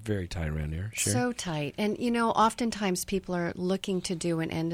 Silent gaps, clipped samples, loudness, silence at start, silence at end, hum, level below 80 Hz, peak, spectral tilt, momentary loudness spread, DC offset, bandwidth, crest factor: none; under 0.1%; -29 LUFS; 0 s; 0 s; none; -46 dBFS; -12 dBFS; -4.5 dB/octave; 8 LU; under 0.1%; 16.5 kHz; 18 dB